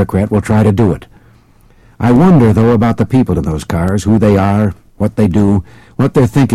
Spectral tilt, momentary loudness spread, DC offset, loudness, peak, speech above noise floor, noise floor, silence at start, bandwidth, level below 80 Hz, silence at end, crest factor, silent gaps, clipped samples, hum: -8.5 dB/octave; 9 LU; under 0.1%; -11 LUFS; -2 dBFS; 35 dB; -45 dBFS; 0 s; 13.5 kHz; -32 dBFS; 0 s; 8 dB; none; under 0.1%; none